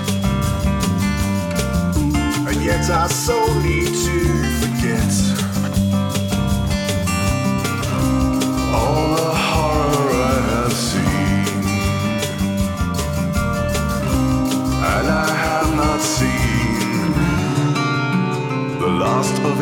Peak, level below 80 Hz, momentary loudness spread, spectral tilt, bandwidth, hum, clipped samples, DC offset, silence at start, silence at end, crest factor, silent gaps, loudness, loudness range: -4 dBFS; -28 dBFS; 3 LU; -5 dB/octave; 19.5 kHz; none; under 0.1%; under 0.1%; 0 s; 0 s; 14 dB; none; -18 LUFS; 2 LU